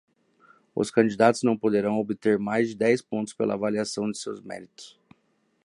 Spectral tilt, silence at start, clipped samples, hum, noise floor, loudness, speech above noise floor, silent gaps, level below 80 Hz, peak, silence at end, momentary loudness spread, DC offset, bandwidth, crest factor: -5.5 dB/octave; 0.75 s; under 0.1%; none; -69 dBFS; -25 LUFS; 44 dB; none; -68 dBFS; -6 dBFS; 0.75 s; 16 LU; under 0.1%; 11.5 kHz; 20 dB